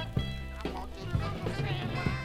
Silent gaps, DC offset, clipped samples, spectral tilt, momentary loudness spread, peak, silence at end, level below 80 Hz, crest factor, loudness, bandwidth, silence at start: none; under 0.1%; under 0.1%; -6.5 dB/octave; 6 LU; -16 dBFS; 0 s; -42 dBFS; 18 dB; -35 LUFS; 15.5 kHz; 0 s